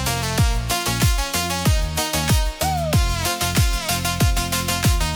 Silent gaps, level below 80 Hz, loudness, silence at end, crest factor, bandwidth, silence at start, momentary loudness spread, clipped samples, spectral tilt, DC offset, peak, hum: none; -24 dBFS; -20 LUFS; 0 s; 12 dB; over 20 kHz; 0 s; 2 LU; under 0.1%; -3.5 dB/octave; under 0.1%; -8 dBFS; none